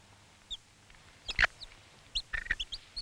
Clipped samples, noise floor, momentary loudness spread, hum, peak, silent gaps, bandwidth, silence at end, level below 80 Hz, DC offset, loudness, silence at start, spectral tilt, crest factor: under 0.1%; -59 dBFS; 20 LU; none; -14 dBFS; none; 13 kHz; 0 s; -48 dBFS; under 0.1%; -35 LUFS; 0.5 s; -1 dB/octave; 24 dB